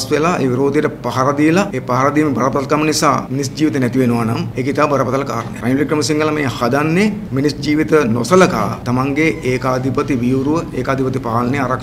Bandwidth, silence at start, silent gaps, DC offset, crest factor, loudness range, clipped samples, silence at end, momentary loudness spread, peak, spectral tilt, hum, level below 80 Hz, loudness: 15.5 kHz; 0 s; none; under 0.1%; 16 dB; 2 LU; under 0.1%; 0 s; 5 LU; 0 dBFS; -6 dB/octave; none; -42 dBFS; -16 LUFS